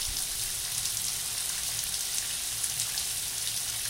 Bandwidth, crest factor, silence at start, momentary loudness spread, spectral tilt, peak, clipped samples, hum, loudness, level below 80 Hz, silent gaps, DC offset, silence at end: 17 kHz; 22 dB; 0 s; 1 LU; 1 dB/octave; -10 dBFS; under 0.1%; none; -29 LUFS; -52 dBFS; none; under 0.1%; 0 s